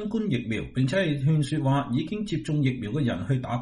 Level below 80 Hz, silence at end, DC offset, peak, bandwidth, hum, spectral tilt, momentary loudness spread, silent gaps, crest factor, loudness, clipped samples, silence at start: -52 dBFS; 0 s; under 0.1%; -12 dBFS; 11.5 kHz; none; -7.5 dB/octave; 4 LU; none; 14 dB; -26 LUFS; under 0.1%; 0 s